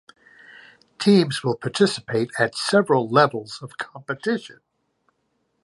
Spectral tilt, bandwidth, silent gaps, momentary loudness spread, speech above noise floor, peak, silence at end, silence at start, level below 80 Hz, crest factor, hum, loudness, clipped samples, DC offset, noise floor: -5.5 dB/octave; 11.5 kHz; none; 15 LU; 50 dB; -2 dBFS; 1.1 s; 1 s; -68 dBFS; 20 dB; none; -21 LUFS; under 0.1%; under 0.1%; -71 dBFS